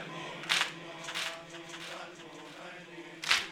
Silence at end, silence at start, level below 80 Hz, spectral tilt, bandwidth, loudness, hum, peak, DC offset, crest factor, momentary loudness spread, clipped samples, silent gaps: 0 s; 0 s; -72 dBFS; -1 dB/octave; 16 kHz; -34 LUFS; none; -8 dBFS; under 0.1%; 30 dB; 17 LU; under 0.1%; none